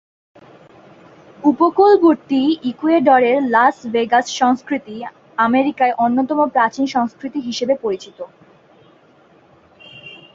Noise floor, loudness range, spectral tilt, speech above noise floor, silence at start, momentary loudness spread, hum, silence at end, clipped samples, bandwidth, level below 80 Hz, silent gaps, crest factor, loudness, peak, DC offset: -50 dBFS; 8 LU; -4.5 dB/octave; 35 dB; 1.45 s; 17 LU; none; 0.2 s; under 0.1%; 7.8 kHz; -62 dBFS; none; 16 dB; -16 LUFS; -2 dBFS; under 0.1%